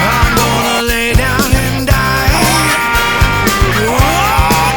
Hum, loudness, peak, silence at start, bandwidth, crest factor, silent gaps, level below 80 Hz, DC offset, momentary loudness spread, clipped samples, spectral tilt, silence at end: none; -11 LUFS; 0 dBFS; 0 s; over 20 kHz; 10 dB; none; -18 dBFS; under 0.1%; 2 LU; under 0.1%; -4 dB/octave; 0 s